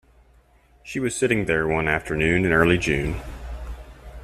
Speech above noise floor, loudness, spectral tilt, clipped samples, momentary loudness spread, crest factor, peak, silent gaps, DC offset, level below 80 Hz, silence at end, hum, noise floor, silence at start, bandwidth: 35 dB; -22 LUFS; -5.5 dB/octave; under 0.1%; 19 LU; 20 dB; -4 dBFS; none; under 0.1%; -38 dBFS; 0 s; none; -56 dBFS; 0.85 s; 14.5 kHz